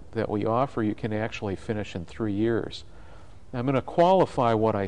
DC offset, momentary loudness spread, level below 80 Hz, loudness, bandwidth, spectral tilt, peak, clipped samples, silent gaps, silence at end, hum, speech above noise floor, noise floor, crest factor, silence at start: 0.7%; 12 LU; -52 dBFS; -26 LUFS; 10.5 kHz; -7.5 dB/octave; -10 dBFS; under 0.1%; none; 0 s; none; 23 dB; -49 dBFS; 16 dB; 0 s